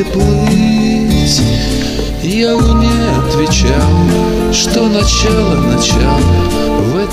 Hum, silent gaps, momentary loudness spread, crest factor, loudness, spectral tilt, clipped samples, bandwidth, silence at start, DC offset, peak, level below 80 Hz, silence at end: none; none; 3 LU; 10 dB; -11 LUFS; -5 dB/octave; under 0.1%; 16 kHz; 0 s; under 0.1%; 0 dBFS; -18 dBFS; 0 s